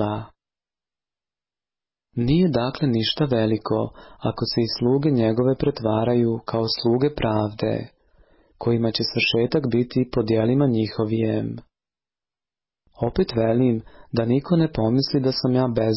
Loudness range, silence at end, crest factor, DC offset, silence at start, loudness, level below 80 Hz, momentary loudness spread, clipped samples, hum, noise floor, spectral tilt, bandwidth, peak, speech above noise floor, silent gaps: 3 LU; 0 s; 14 dB; under 0.1%; 0 s; -22 LUFS; -48 dBFS; 8 LU; under 0.1%; none; under -90 dBFS; -10 dB/octave; 5.8 kHz; -8 dBFS; over 69 dB; none